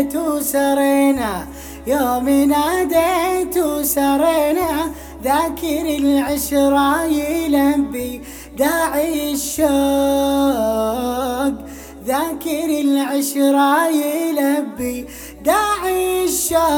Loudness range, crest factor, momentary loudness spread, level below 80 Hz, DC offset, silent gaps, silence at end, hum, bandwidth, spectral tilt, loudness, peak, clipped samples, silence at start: 2 LU; 14 dB; 9 LU; -40 dBFS; under 0.1%; none; 0 s; none; over 20 kHz; -3.5 dB/octave; -17 LUFS; -2 dBFS; under 0.1%; 0 s